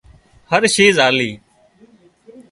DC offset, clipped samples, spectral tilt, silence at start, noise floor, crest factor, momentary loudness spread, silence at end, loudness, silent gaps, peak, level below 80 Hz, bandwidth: under 0.1%; under 0.1%; -3 dB/octave; 0.5 s; -51 dBFS; 18 dB; 8 LU; 0.1 s; -14 LUFS; none; 0 dBFS; -54 dBFS; 11.5 kHz